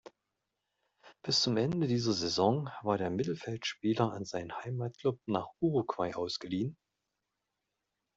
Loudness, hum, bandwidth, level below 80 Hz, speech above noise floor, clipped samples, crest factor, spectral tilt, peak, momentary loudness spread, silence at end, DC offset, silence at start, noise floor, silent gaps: -33 LUFS; none; 8 kHz; -70 dBFS; 53 dB; under 0.1%; 22 dB; -5.5 dB/octave; -14 dBFS; 9 LU; 1.4 s; under 0.1%; 1.05 s; -86 dBFS; none